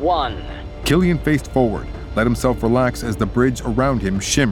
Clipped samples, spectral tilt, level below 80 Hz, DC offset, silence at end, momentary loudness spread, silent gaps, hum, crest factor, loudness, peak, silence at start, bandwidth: under 0.1%; -5.5 dB/octave; -30 dBFS; under 0.1%; 0 s; 8 LU; none; none; 16 dB; -19 LUFS; -2 dBFS; 0 s; 18 kHz